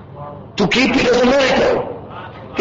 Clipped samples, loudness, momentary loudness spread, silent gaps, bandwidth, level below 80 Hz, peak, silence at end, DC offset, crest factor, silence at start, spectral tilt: under 0.1%; -14 LUFS; 19 LU; none; 8 kHz; -40 dBFS; -4 dBFS; 0 s; under 0.1%; 12 dB; 0 s; -4.5 dB/octave